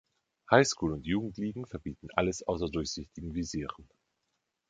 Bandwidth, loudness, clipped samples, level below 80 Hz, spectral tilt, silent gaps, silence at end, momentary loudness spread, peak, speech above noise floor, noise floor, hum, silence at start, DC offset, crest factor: 9.4 kHz; -32 LUFS; under 0.1%; -52 dBFS; -4.5 dB/octave; none; 0.85 s; 15 LU; -6 dBFS; 50 dB; -82 dBFS; none; 0.5 s; under 0.1%; 26 dB